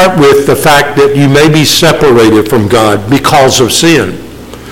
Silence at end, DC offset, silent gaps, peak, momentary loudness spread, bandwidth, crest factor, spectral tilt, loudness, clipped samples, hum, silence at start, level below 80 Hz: 0 s; under 0.1%; none; 0 dBFS; 5 LU; 17.5 kHz; 6 dB; -4.5 dB/octave; -6 LUFS; 0.2%; none; 0 s; -32 dBFS